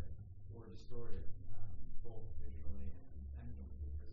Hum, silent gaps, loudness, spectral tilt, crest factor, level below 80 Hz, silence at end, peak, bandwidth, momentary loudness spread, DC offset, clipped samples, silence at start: none; none; -52 LUFS; -9 dB/octave; 12 dB; -48 dBFS; 0 s; -24 dBFS; 1.8 kHz; 5 LU; under 0.1%; under 0.1%; 0 s